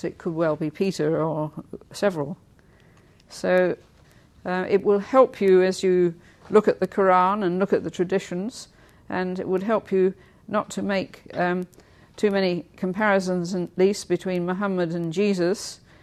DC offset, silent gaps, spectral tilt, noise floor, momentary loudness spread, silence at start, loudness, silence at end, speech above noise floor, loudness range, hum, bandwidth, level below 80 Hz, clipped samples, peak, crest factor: under 0.1%; none; -6 dB/octave; -54 dBFS; 13 LU; 0.05 s; -23 LUFS; 0.25 s; 31 dB; 6 LU; none; 13.5 kHz; -60 dBFS; under 0.1%; -4 dBFS; 20 dB